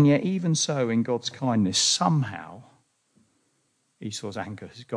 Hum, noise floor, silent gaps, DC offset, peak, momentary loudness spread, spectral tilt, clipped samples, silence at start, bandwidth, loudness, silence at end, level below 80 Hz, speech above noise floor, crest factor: none; -71 dBFS; none; under 0.1%; -8 dBFS; 18 LU; -4.5 dB/octave; under 0.1%; 0 s; 10.5 kHz; -25 LUFS; 0 s; -72 dBFS; 46 dB; 18 dB